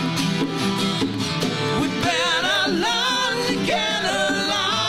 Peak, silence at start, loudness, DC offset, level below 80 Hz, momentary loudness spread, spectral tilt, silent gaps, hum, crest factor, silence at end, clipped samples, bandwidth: -10 dBFS; 0 s; -21 LUFS; under 0.1%; -50 dBFS; 4 LU; -3.5 dB/octave; none; none; 12 dB; 0 s; under 0.1%; 16.5 kHz